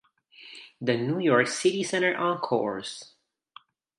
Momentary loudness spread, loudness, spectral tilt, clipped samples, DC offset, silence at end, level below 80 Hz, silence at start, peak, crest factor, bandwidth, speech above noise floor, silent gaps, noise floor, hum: 20 LU; -26 LUFS; -4.5 dB/octave; under 0.1%; under 0.1%; 0.95 s; -74 dBFS; 0.4 s; -8 dBFS; 20 dB; 11.5 kHz; 29 dB; none; -55 dBFS; none